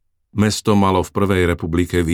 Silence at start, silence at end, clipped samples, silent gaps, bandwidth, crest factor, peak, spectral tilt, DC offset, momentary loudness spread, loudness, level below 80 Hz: 0.35 s; 0 s; under 0.1%; none; 16.5 kHz; 16 dB; -2 dBFS; -6 dB/octave; under 0.1%; 4 LU; -18 LUFS; -36 dBFS